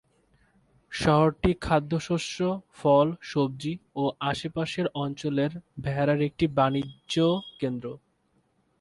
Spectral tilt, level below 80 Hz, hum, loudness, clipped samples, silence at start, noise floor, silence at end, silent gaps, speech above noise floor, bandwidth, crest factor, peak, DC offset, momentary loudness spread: -6.5 dB/octave; -50 dBFS; none; -27 LUFS; under 0.1%; 0.9 s; -69 dBFS; 0.85 s; none; 43 dB; 11.5 kHz; 18 dB; -8 dBFS; under 0.1%; 10 LU